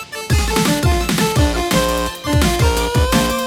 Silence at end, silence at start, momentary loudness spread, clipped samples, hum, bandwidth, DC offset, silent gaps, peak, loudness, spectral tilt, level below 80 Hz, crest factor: 0 s; 0 s; 4 LU; under 0.1%; none; over 20 kHz; under 0.1%; none; -2 dBFS; -16 LUFS; -4.5 dB/octave; -22 dBFS; 14 dB